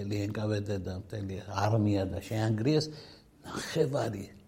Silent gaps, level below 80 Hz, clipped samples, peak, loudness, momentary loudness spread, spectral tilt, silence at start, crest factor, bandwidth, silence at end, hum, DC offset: none; -58 dBFS; under 0.1%; -14 dBFS; -32 LUFS; 11 LU; -6.5 dB/octave; 0 s; 18 dB; 16 kHz; 0.1 s; none; under 0.1%